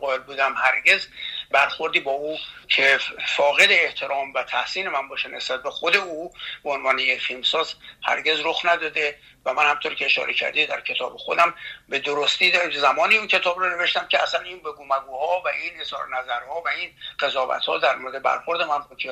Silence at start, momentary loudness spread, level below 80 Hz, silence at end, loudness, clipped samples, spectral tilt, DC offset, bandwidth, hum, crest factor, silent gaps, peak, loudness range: 0 s; 11 LU; -62 dBFS; 0 s; -21 LUFS; under 0.1%; -1 dB/octave; under 0.1%; 15 kHz; none; 20 dB; none; -4 dBFS; 5 LU